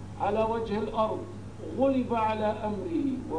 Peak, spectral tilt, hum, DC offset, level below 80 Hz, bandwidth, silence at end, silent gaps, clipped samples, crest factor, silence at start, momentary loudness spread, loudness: -12 dBFS; -7.5 dB/octave; none; 0.3%; -52 dBFS; 10.5 kHz; 0 s; none; under 0.1%; 16 dB; 0 s; 10 LU; -29 LUFS